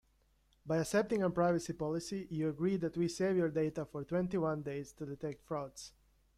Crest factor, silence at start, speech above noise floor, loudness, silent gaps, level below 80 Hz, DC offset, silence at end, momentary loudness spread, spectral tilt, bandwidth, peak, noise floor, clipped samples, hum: 18 dB; 0.65 s; 37 dB; -36 LUFS; none; -66 dBFS; under 0.1%; 0.5 s; 11 LU; -6.5 dB/octave; 14 kHz; -18 dBFS; -72 dBFS; under 0.1%; none